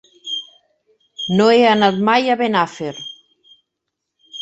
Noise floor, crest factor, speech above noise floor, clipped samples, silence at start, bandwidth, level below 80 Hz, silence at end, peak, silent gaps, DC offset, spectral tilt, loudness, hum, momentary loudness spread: -78 dBFS; 18 dB; 63 dB; under 0.1%; 0.25 s; 8.2 kHz; -62 dBFS; 0 s; -2 dBFS; none; under 0.1%; -5.5 dB/octave; -16 LUFS; none; 17 LU